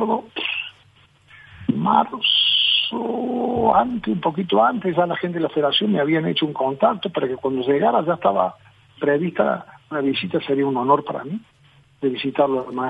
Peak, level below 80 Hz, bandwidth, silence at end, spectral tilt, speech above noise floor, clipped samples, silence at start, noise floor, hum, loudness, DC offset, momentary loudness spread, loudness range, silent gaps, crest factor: -2 dBFS; -58 dBFS; 5.2 kHz; 0 s; -7.5 dB/octave; 34 dB; under 0.1%; 0 s; -54 dBFS; none; -20 LUFS; under 0.1%; 8 LU; 4 LU; none; 20 dB